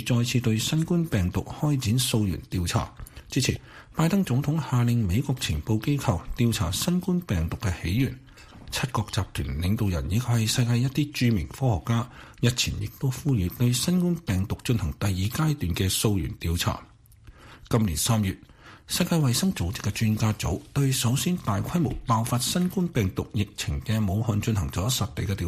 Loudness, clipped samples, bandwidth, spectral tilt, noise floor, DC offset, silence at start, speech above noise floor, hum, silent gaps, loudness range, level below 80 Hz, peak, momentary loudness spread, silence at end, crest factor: -26 LUFS; under 0.1%; 15.5 kHz; -5 dB/octave; -51 dBFS; under 0.1%; 0 s; 25 dB; none; none; 2 LU; -42 dBFS; -8 dBFS; 6 LU; 0 s; 18 dB